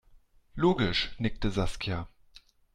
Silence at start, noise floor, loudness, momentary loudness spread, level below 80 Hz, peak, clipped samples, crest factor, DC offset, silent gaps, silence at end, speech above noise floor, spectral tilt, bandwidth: 0.55 s; -59 dBFS; -30 LUFS; 13 LU; -42 dBFS; -12 dBFS; under 0.1%; 18 dB; under 0.1%; none; 0.35 s; 31 dB; -6 dB/octave; 11.5 kHz